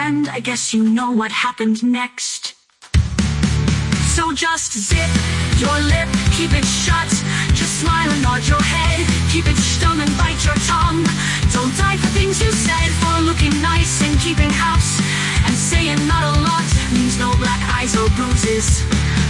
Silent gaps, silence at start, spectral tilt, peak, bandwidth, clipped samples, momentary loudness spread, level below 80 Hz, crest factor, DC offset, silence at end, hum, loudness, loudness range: none; 0 s; -4 dB/octave; -2 dBFS; 11.5 kHz; under 0.1%; 3 LU; -24 dBFS; 14 dB; under 0.1%; 0 s; none; -16 LUFS; 3 LU